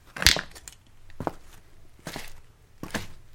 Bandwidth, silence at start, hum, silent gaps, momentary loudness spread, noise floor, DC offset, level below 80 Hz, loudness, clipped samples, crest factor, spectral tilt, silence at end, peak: 17 kHz; 0.05 s; none; none; 25 LU; -48 dBFS; under 0.1%; -44 dBFS; -27 LUFS; under 0.1%; 32 dB; -1.5 dB/octave; 0 s; 0 dBFS